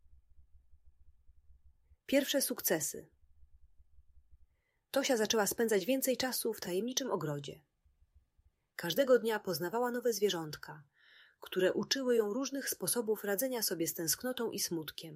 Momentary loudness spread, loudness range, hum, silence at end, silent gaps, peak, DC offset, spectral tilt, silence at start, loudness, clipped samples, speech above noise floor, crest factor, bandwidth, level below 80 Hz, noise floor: 12 LU; 3 LU; none; 0 s; none; -16 dBFS; under 0.1%; -3 dB/octave; 0.1 s; -34 LUFS; under 0.1%; 39 dB; 20 dB; 16 kHz; -70 dBFS; -73 dBFS